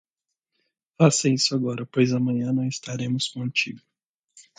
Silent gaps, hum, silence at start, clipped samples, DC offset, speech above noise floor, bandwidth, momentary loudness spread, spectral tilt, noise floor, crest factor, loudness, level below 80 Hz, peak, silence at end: 4.06-4.28 s; none; 1 s; under 0.1%; under 0.1%; 61 dB; 9.4 kHz; 9 LU; -4.5 dB/octave; -84 dBFS; 20 dB; -23 LUFS; -66 dBFS; -6 dBFS; 0.2 s